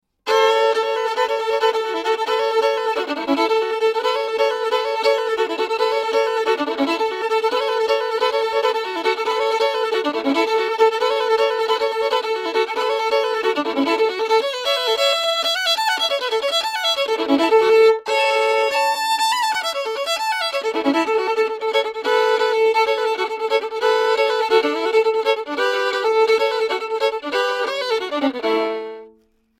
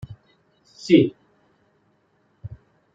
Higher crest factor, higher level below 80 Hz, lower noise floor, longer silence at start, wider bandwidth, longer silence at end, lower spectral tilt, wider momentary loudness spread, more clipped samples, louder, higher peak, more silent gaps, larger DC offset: second, 16 dB vs 22 dB; second, -66 dBFS vs -58 dBFS; second, -56 dBFS vs -65 dBFS; first, 0.25 s vs 0.1 s; first, 16 kHz vs 7.8 kHz; about the same, 0.5 s vs 0.5 s; second, -1 dB/octave vs -7 dB/octave; second, 5 LU vs 25 LU; neither; about the same, -19 LUFS vs -19 LUFS; about the same, -4 dBFS vs -4 dBFS; neither; neither